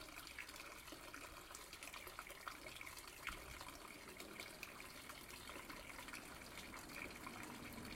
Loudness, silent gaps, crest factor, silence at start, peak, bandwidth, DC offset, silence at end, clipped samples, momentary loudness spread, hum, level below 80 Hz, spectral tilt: -53 LUFS; none; 22 dB; 0 s; -32 dBFS; 16.5 kHz; under 0.1%; 0 s; under 0.1%; 4 LU; none; -68 dBFS; -2.5 dB/octave